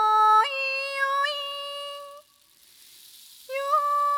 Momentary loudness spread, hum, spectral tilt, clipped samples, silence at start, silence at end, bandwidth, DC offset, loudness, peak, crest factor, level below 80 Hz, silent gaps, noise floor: 20 LU; none; 2.5 dB/octave; under 0.1%; 0 s; 0 s; over 20 kHz; under 0.1%; -24 LUFS; -10 dBFS; 16 dB; -86 dBFS; none; -58 dBFS